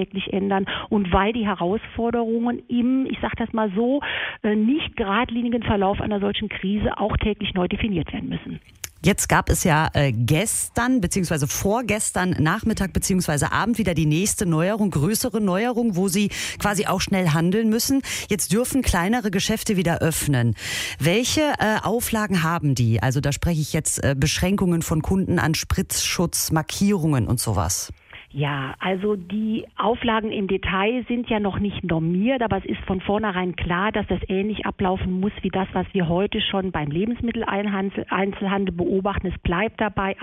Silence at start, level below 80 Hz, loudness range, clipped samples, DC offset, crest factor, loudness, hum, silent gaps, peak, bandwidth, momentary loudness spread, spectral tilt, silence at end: 0 s; -38 dBFS; 3 LU; under 0.1%; under 0.1%; 18 dB; -22 LUFS; none; none; -4 dBFS; 16 kHz; 5 LU; -5 dB/octave; 0 s